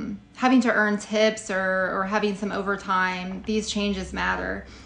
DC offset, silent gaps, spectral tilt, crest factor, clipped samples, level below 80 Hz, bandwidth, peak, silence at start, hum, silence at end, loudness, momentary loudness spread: under 0.1%; none; -4.5 dB/octave; 16 dB; under 0.1%; -48 dBFS; 10 kHz; -8 dBFS; 0 s; none; 0 s; -24 LUFS; 8 LU